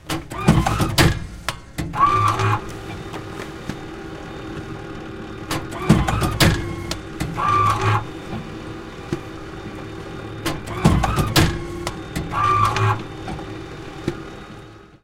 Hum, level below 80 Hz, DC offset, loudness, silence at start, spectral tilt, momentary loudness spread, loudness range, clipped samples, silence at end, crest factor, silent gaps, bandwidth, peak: none; -34 dBFS; under 0.1%; -21 LUFS; 0.05 s; -5 dB/octave; 16 LU; 6 LU; under 0.1%; 0.1 s; 22 dB; none; 17 kHz; 0 dBFS